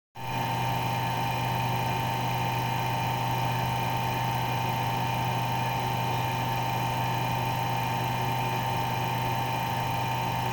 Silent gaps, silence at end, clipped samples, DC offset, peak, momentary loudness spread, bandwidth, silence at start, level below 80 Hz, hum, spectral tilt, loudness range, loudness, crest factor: none; 0 s; under 0.1%; under 0.1%; -16 dBFS; 1 LU; over 20 kHz; 0.15 s; -50 dBFS; none; -5 dB/octave; 0 LU; -28 LUFS; 12 dB